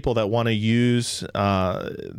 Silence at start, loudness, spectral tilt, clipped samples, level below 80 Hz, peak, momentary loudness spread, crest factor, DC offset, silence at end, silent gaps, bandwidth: 0.05 s; -22 LUFS; -5.5 dB/octave; under 0.1%; -46 dBFS; -10 dBFS; 6 LU; 12 dB; under 0.1%; 0 s; none; 14.5 kHz